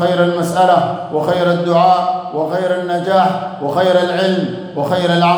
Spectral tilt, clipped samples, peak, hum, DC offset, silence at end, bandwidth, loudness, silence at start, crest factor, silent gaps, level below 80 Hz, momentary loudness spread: -6 dB/octave; under 0.1%; 0 dBFS; none; under 0.1%; 0 s; over 20 kHz; -15 LUFS; 0 s; 14 dB; none; -60 dBFS; 7 LU